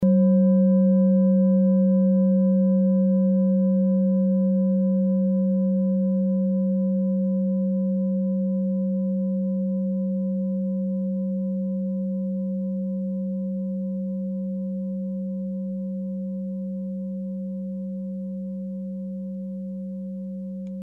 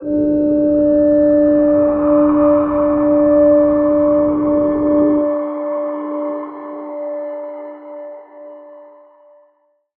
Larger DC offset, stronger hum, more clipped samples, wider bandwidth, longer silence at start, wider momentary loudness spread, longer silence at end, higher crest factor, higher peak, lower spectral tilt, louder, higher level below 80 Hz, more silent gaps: neither; neither; neither; second, 1.7 kHz vs 2.6 kHz; about the same, 0 s vs 0 s; second, 13 LU vs 17 LU; second, 0 s vs 1.15 s; about the same, 12 dB vs 12 dB; second, -12 dBFS vs -4 dBFS; first, -14 dB/octave vs -12.5 dB/octave; second, -24 LUFS vs -14 LUFS; second, -62 dBFS vs -44 dBFS; neither